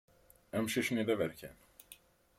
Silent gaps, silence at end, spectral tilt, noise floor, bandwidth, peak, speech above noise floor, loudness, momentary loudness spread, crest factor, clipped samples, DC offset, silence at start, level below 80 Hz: none; 0.45 s; -4.5 dB/octave; -61 dBFS; 16.5 kHz; -20 dBFS; 26 dB; -35 LUFS; 22 LU; 18 dB; under 0.1%; under 0.1%; 0.55 s; -70 dBFS